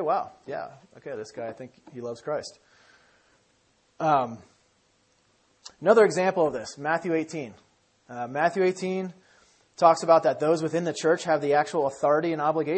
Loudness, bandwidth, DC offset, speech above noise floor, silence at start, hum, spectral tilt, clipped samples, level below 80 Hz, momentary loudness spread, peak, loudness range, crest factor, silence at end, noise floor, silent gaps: -25 LUFS; 8.8 kHz; under 0.1%; 41 dB; 0 s; none; -5.5 dB/octave; under 0.1%; -72 dBFS; 18 LU; -4 dBFS; 11 LU; 22 dB; 0 s; -66 dBFS; none